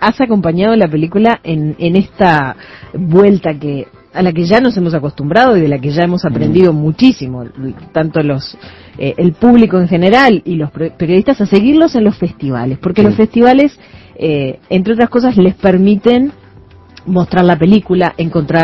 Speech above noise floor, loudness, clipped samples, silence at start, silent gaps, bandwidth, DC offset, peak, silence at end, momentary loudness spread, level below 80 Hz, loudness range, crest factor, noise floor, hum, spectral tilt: 28 dB; -11 LUFS; 0.6%; 0 s; none; 7.6 kHz; under 0.1%; 0 dBFS; 0 s; 11 LU; -40 dBFS; 2 LU; 10 dB; -39 dBFS; none; -8.5 dB/octave